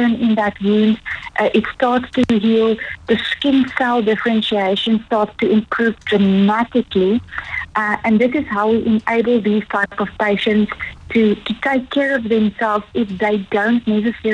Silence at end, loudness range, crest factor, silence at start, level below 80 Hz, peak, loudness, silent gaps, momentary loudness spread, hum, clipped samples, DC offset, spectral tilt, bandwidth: 0 s; 1 LU; 16 dB; 0 s; -46 dBFS; -2 dBFS; -17 LUFS; none; 5 LU; none; under 0.1%; under 0.1%; -7 dB/octave; 8.2 kHz